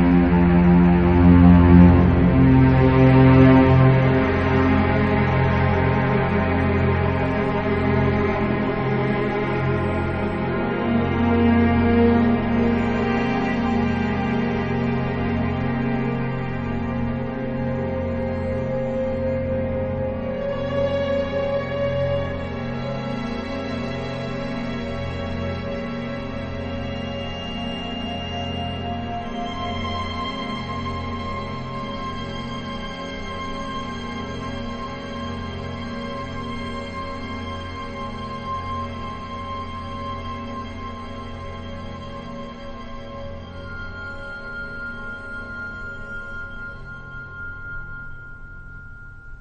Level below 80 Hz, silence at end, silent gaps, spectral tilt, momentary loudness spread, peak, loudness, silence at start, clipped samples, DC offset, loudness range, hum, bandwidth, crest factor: -36 dBFS; 0 s; none; -8.5 dB/octave; 18 LU; 0 dBFS; -21 LUFS; 0 s; under 0.1%; under 0.1%; 17 LU; none; 6.8 kHz; 20 dB